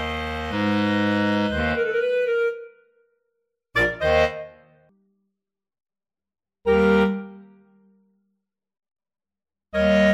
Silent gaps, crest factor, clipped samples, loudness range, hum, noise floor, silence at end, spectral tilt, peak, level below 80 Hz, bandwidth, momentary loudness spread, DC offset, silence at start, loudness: none; 18 dB; under 0.1%; 3 LU; none; under -90 dBFS; 0 s; -6.5 dB/octave; -6 dBFS; -44 dBFS; 12.5 kHz; 11 LU; under 0.1%; 0 s; -22 LUFS